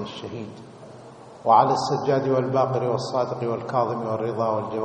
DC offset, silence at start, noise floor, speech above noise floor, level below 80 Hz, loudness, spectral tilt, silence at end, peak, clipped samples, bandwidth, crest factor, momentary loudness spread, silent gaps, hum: under 0.1%; 0 s; -44 dBFS; 21 dB; -66 dBFS; -23 LUFS; -6.5 dB/octave; 0 s; -4 dBFS; under 0.1%; 9.2 kHz; 20 dB; 23 LU; none; none